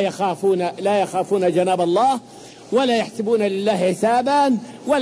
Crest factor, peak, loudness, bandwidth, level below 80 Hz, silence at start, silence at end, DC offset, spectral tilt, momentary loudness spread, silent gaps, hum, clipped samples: 12 dB; -6 dBFS; -19 LUFS; 11 kHz; -64 dBFS; 0 s; 0 s; under 0.1%; -5.5 dB/octave; 4 LU; none; none; under 0.1%